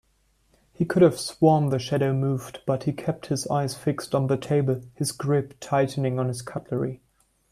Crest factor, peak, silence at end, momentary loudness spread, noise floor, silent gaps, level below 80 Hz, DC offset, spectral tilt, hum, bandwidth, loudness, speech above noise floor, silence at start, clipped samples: 18 dB; -6 dBFS; 0.55 s; 10 LU; -66 dBFS; none; -58 dBFS; under 0.1%; -6.5 dB/octave; none; 14 kHz; -25 LUFS; 42 dB; 0.8 s; under 0.1%